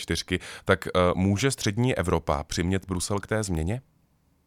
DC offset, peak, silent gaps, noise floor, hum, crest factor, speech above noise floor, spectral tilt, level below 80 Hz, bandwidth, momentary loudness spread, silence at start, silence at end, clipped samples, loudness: under 0.1%; -8 dBFS; none; -66 dBFS; none; 20 dB; 40 dB; -5 dB/octave; -42 dBFS; 15.5 kHz; 7 LU; 0 s; 0.65 s; under 0.1%; -26 LUFS